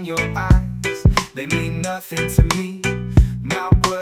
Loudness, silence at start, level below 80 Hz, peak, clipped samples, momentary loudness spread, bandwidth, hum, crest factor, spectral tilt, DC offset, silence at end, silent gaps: -19 LUFS; 0 s; -22 dBFS; 0 dBFS; under 0.1%; 6 LU; 16.5 kHz; none; 18 dB; -5.5 dB/octave; under 0.1%; 0 s; none